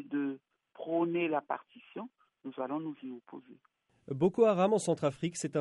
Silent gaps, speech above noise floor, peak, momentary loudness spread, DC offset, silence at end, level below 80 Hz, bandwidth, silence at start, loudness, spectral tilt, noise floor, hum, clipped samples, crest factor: none; 19 dB; -14 dBFS; 22 LU; under 0.1%; 0 s; -76 dBFS; 11.5 kHz; 0 s; -32 LUFS; -6 dB/octave; -51 dBFS; none; under 0.1%; 20 dB